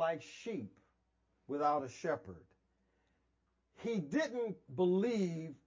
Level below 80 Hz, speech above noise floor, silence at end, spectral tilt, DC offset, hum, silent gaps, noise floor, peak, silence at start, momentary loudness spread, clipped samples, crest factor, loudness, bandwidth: -74 dBFS; 42 dB; 0.1 s; -6.5 dB/octave; under 0.1%; none; none; -80 dBFS; -20 dBFS; 0 s; 12 LU; under 0.1%; 18 dB; -37 LUFS; 7.6 kHz